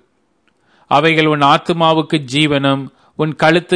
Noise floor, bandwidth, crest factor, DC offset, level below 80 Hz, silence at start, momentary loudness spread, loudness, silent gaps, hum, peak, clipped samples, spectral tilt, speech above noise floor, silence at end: -61 dBFS; 10.5 kHz; 14 dB; under 0.1%; -54 dBFS; 0.9 s; 10 LU; -14 LUFS; none; none; 0 dBFS; under 0.1%; -5.5 dB/octave; 48 dB; 0 s